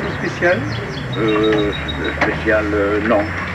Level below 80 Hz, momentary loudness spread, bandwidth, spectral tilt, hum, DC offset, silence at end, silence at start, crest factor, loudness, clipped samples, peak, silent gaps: -34 dBFS; 6 LU; 11 kHz; -6.5 dB/octave; none; under 0.1%; 0 s; 0 s; 14 dB; -18 LUFS; under 0.1%; -4 dBFS; none